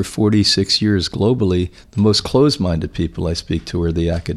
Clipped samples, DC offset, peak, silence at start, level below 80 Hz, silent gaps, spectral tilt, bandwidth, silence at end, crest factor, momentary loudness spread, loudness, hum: under 0.1%; under 0.1%; -2 dBFS; 0 s; -34 dBFS; none; -5.5 dB/octave; 13 kHz; 0 s; 14 dB; 8 LU; -17 LUFS; none